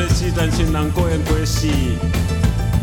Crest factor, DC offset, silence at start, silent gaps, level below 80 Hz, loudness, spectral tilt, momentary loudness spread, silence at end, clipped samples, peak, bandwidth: 14 dB; 0.2%; 0 s; none; -22 dBFS; -18 LUFS; -5.5 dB/octave; 2 LU; 0 s; under 0.1%; -4 dBFS; 18 kHz